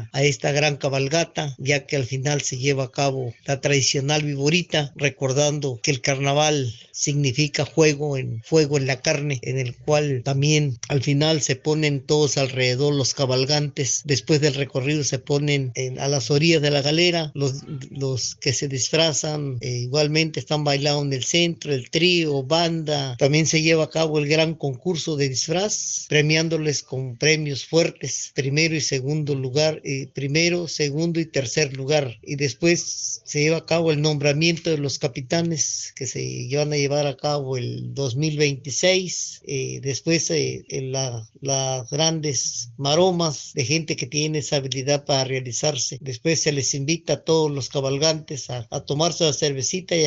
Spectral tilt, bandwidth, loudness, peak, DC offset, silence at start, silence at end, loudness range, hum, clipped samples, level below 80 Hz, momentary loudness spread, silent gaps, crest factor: -4.5 dB/octave; 8 kHz; -22 LUFS; -2 dBFS; under 0.1%; 0 s; 0 s; 2 LU; none; under 0.1%; -58 dBFS; 8 LU; none; 20 dB